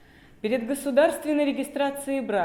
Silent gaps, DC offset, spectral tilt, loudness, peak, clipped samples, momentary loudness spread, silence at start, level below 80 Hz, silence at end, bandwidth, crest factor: none; under 0.1%; -4 dB/octave; -25 LUFS; -8 dBFS; under 0.1%; 7 LU; 0.45 s; -62 dBFS; 0 s; 17.5 kHz; 18 dB